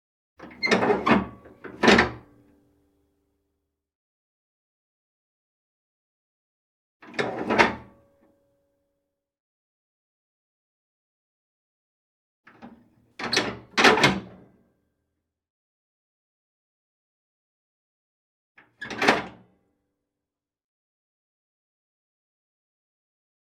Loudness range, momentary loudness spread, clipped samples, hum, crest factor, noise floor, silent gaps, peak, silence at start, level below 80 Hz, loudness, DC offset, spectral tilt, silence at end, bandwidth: 9 LU; 21 LU; under 0.1%; none; 30 dB; -89 dBFS; 3.95-7.00 s, 9.40-12.44 s, 15.50-18.55 s; 0 dBFS; 0.4 s; -56 dBFS; -22 LUFS; under 0.1%; -4 dB/octave; 4.1 s; 15 kHz